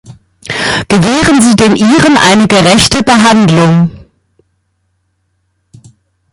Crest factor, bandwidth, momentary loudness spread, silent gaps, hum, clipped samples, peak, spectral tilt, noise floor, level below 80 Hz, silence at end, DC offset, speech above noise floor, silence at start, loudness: 8 dB; 16 kHz; 8 LU; none; none; 0.2%; 0 dBFS; -4.5 dB/octave; -60 dBFS; -36 dBFS; 2.35 s; under 0.1%; 54 dB; 0.1 s; -7 LUFS